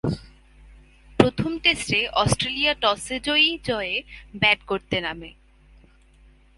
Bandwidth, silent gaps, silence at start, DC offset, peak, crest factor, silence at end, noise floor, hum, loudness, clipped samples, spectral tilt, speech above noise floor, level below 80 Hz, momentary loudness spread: 11.5 kHz; none; 0.05 s; under 0.1%; 0 dBFS; 24 dB; 1.3 s; -54 dBFS; none; -22 LUFS; under 0.1%; -4 dB/octave; 30 dB; -46 dBFS; 12 LU